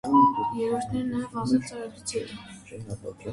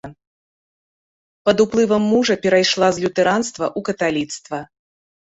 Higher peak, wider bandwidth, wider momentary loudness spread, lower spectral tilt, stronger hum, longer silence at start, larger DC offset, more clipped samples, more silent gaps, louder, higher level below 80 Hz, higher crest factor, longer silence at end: second, -8 dBFS vs -2 dBFS; first, 11.5 kHz vs 8.4 kHz; first, 18 LU vs 10 LU; first, -5.5 dB/octave vs -4 dB/octave; neither; about the same, 0.05 s vs 0.05 s; neither; neither; second, none vs 0.27-1.45 s; second, -27 LUFS vs -18 LUFS; about the same, -56 dBFS vs -56 dBFS; about the same, 18 dB vs 18 dB; second, 0 s vs 0.65 s